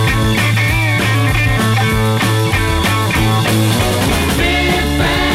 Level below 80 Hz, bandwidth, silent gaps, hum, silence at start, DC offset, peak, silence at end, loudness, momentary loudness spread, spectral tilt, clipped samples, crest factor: -24 dBFS; 16 kHz; none; none; 0 s; under 0.1%; -2 dBFS; 0 s; -13 LUFS; 1 LU; -5 dB/octave; under 0.1%; 12 dB